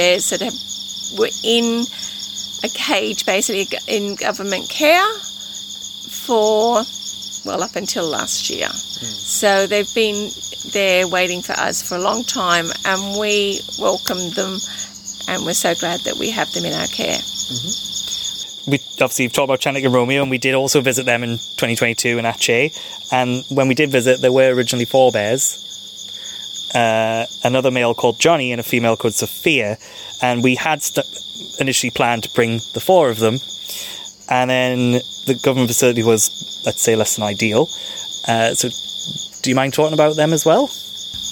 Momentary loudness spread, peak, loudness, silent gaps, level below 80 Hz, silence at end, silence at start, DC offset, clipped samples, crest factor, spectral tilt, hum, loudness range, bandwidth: 11 LU; -2 dBFS; -17 LUFS; none; -58 dBFS; 0 s; 0 s; under 0.1%; under 0.1%; 16 dB; -3 dB/octave; none; 3 LU; 17.5 kHz